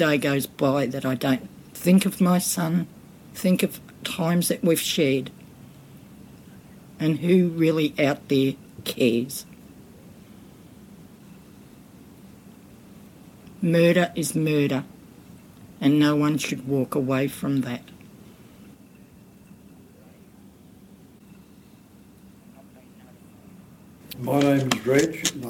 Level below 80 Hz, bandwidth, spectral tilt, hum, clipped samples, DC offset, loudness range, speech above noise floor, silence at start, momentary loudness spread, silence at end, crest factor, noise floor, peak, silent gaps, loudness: -62 dBFS; 17.5 kHz; -5.5 dB/octave; none; under 0.1%; under 0.1%; 8 LU; 28 dB; 0 s; 13 LU; 0 s; 20 dB; -50 dBFS; -6 dBFS; none; -23 LUFS